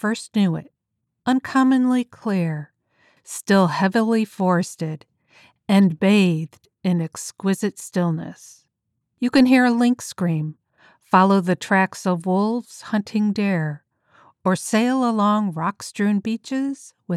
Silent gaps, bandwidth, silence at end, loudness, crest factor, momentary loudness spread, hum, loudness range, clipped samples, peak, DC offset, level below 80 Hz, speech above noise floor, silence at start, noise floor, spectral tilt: none; 13.5 kHz; 0 s; -21 LUFS; 18 dB; 13 LU; none; 3 LU; under 0.1%; -4 dBFS; under 0.1%; -68 dBFS; 58 dB; 0.05 s; -78 dBFS; -6 dB/octave